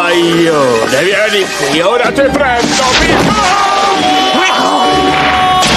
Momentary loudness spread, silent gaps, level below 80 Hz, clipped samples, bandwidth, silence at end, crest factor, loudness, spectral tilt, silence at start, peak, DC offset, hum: 2 LU; none; -32 dBFS; under 0.1%; 15 kHz; 0 s; 10 dB; -9 LUFS; -3 dB/octave; 0 s; 0 dBFS; under 0.1%; none